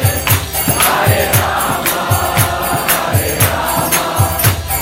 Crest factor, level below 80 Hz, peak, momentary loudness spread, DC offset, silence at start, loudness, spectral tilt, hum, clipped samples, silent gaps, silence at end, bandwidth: 14 dB; -30 dBFS; 0 dBFS; 4 LU; under 0.1%; 0 s; -13 LUFS; -3.5 dB/octave; none; under 0.1%; none; 0 s; 17.5 kHz